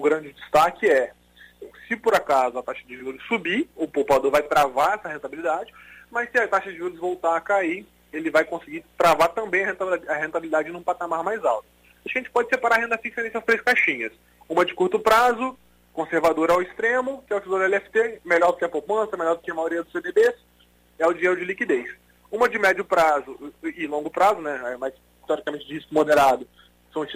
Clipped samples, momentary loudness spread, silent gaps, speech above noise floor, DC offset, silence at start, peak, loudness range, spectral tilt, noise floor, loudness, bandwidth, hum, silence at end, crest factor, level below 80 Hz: under 0.1%; 13 LU; none; 35 dB; under 0.1%; 0 s; -6 dBFS; 3 LU; -4 dB/octave; -58 dBFS; -23 LUFS; 16 kHz; 60 Hz at -60 dBFS; 0 s; 16 dB; -58 dBFS